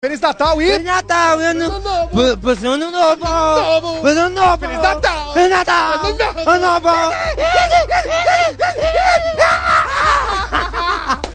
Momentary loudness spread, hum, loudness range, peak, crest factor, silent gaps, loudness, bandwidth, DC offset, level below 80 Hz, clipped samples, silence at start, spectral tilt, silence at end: 5 LU; none; 1 LU; 0 dBFS; 14 dB; none; -14 LUFS; 9.4 kHz; under 0.1%; -30 dBFS; under 0.1%; 0.05 s; -4 dB/octave; 0 s